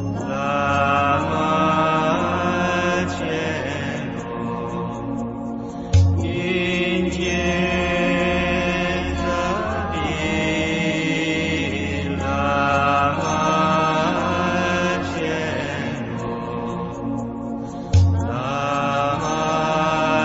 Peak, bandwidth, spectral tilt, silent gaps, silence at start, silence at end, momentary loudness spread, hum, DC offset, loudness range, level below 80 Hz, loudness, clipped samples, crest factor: -6 dBFS; 8 kHz; -5.5 dB/octave; none; 0 s; 0 s; 9 LU; none; under 0.1%; 4 LU; -38 dBFS; -21 LUFS; under 0.1%; 16 dB